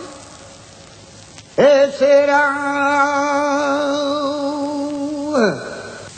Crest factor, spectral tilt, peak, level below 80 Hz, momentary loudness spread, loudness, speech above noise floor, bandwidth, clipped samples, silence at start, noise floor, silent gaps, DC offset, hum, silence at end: 16 dB; -4 dB/octave; -2 dBFS; -56 dBFS; 16 LU; -16 LUFS; 27 dB; 9.2 kHz; under 0.1%; 0 s; -41 dBFS; none; under 0.1%; none; 0 s